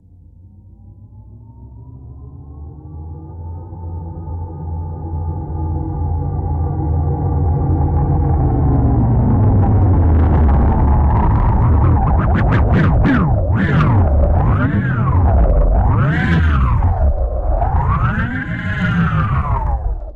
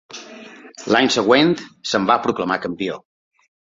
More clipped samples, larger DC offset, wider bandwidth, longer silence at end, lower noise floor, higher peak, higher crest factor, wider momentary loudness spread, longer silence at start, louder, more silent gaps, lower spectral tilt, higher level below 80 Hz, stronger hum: neither; neither; second, 4.4 kHz vs 7.8 kHz; second, 0 s vs 0.8 s; about the same, -42 dBFS vs -40 dBFS; about the same, -4 dBFS vs -2 dBFS; second, 10 dB vs 20 dB; second, 17 LU vs 22 LU; first, 0.85 s vs 0.1 s; about the same, -16 LUFS vs -18 LUFS; neither; first, -10 dB/octave vs -4 dB/octave; first, -20 dBFS vs -60 dBFS; neither